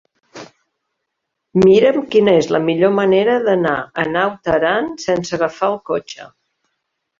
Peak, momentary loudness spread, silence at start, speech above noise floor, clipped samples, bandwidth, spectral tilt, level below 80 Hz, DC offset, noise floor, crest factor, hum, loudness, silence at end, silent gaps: -2 dBFS; 10 LU; 0.35 s; 61 dB; under 0.1%; 7.6 kHz; -6 dB/octave; -52 dBFS; under 0.1%; -76 dBFS; 16 dB; none; -16 LUFS; 0.95 s; none